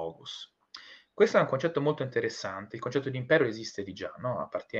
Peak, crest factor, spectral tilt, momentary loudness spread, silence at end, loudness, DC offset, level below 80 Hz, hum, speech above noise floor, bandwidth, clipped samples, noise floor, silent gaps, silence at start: -10 dBFS; 22 dB; -5.5 dB/octave; 20 LU; 0 s; -30 LUFS; under 0.1%; -72 dBFS; none; 21 dB; 8 kHz; under 0.1%; -51 dBFS; none; 0 s